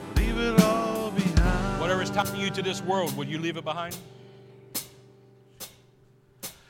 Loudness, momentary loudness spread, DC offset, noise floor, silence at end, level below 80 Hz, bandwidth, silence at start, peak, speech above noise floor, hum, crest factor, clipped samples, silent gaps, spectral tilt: -27 LUFS; 20 LU; under 0.1%; -59 dBFS; 0.15 s; -36 dBFS; 17 kHz; 0 s; -4 dBFS; 29 dB; none; 22 dB; under 0.1%; none; -5 dB/octave